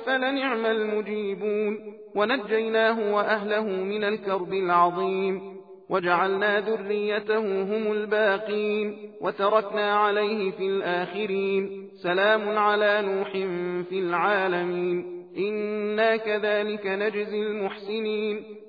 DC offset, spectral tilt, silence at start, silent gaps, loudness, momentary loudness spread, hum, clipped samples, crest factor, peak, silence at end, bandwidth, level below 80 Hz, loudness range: under 0.1%; -7.5 dB/octave; 0 s; none; -25 LUFS; 8 LU; none; under 0.1%; 18 dB; -8 dBFS; 0 s; 5 kHz; -78 dBFS; 2 LU